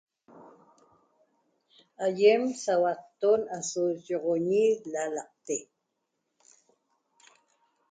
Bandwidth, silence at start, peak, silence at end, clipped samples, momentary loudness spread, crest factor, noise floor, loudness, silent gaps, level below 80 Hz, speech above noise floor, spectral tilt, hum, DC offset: 9.4 kHz; 0.35 s; -10 dBFS; 2.3 s; under 0.1%; 12 LU; 20 dB; -81 dBFS; -28 LUFS; none; -80 dBFS; 54 dB; -4 dB/octave; none; under 0.1%